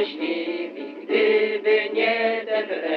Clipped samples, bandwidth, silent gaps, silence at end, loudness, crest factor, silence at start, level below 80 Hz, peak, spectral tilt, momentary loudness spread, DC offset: under 0.1%; 5.4 kHz; none; 0 s; -22 LUFS; 14 dB; 0 s; -82 dBFS; -8 dBFS; -5.5 dB/octave; 10 LU; under 0.1%